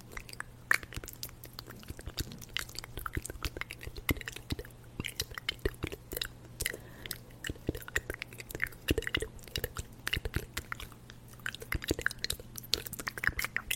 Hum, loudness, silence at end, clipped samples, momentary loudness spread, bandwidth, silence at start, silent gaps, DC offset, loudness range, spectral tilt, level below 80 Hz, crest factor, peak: none; -37 LUFS; 0 s; under 0.1%; 11 LU; 16.5 kHz; 0 s; none; under 0.1%; 3 LU; -3 dB/octave; -48 dBFS; 34 dB; -4 dBFS